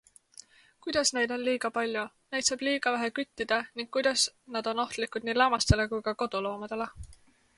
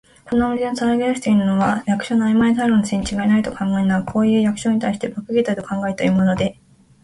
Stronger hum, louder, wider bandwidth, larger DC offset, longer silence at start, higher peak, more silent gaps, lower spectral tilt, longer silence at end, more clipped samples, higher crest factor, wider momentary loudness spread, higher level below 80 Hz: neither; second, -29 LUFS vs -19 LUFS; about the same, 11.5 kHz vs 11.5 kHz; neither; first, 0.85 s vs 0.25 s; about the same, -6 dBFS vs -6 dBFS; neither; second, -3 dB/octave vs -6.5 dB/octave; about the same, 0.45 s vs 0.5 s; neither; first, 24 dB vs 12 dB; first, 9 LU vs 6 LU; about the same, -48 dBFS vs -46 dBFS